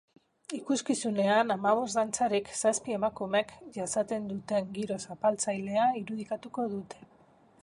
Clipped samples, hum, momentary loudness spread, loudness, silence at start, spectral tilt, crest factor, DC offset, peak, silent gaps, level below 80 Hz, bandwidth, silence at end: under 0.1%; none; 12 LU; -30 LUFS; 0.5 s; -4 dB/octave; 18 dB; under 0.1%; -12 dBFS; none; -70 dBFS; 11.5 kHz; 0.55 s